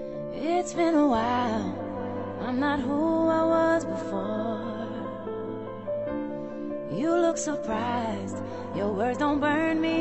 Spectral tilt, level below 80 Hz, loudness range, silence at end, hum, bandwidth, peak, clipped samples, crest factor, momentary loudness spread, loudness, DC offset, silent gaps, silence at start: -5.5 dB/octave; -56 dBFS; 5 LU; 0 s; none; 8.4 kHz; -12 dBFS; under 0.1%; 14 dB; 12 LU; -28 LUFS; under 0.1%; none; 0 s